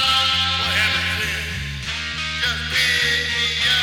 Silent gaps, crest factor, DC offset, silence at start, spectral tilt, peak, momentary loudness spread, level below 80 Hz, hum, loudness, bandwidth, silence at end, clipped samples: none; 14 dB; under 0.1%; 0 s; -1.5 dB/octave; -6 dBFS; 9 LU; -38 dBFS; none; -19 LUFS; over 20 kHz; 0 s; under 0.1%